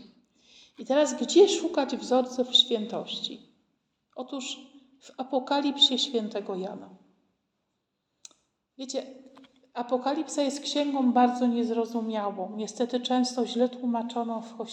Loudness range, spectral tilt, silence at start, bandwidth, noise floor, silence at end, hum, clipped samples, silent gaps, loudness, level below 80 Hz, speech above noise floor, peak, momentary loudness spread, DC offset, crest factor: 11 LU; -3 dB/octave; 0 s; 9.4 kHz; -80 dBFS; 0 s; none; under 0.1%; none; -27 LUFS; -82 dBFS; 53 dB; -8 dBFS; 17 LU; under 0.1%; 20 dB